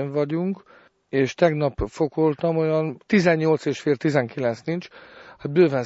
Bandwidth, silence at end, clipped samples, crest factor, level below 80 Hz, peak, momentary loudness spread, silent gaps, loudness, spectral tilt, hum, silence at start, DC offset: 8 kHz; 0 s; under 0.1%; 18 dB; -48 dBFS; -4 dBFS; 10 LU; none; -23 LUFS; -7 dB/octave; none; 0 s; under 0.1%